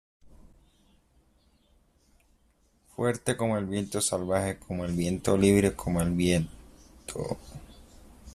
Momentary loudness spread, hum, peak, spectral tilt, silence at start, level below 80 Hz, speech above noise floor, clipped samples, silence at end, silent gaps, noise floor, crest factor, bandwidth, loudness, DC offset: 16 LU; none; -8 dBFS; -5.5 dB/octave; 3 s; -50 dBFS; 39 dB; under 0.1%; 0 s; none; -66 dBFS; 22 dB; 14.5 kHz; -28 LUFS; under 0.1%